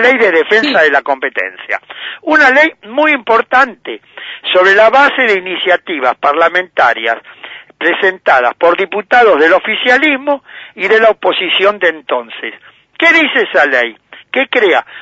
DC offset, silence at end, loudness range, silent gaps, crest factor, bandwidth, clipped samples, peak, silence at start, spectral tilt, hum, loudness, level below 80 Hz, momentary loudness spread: under 0.1%; 0 s; 2 LU; none; 12 dB; 8 kHz; 0.1%; 0 dBFS; 0 s; -3.5 dB/octave; none; -10 LUFS; -56 dBFS; 13 LU